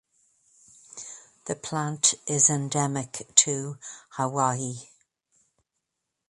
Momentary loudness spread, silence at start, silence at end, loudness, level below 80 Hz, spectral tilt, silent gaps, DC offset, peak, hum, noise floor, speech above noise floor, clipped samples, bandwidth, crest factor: 21 LU; 0.95 s; 1.45 s; -24 LUFS; -68 dBFS; -3 dB/octave; none; under 0.1%; 0 dBFS; none; -83 dBFS; 56 dB; under 0.1%; 11.5 kHz; 28 dB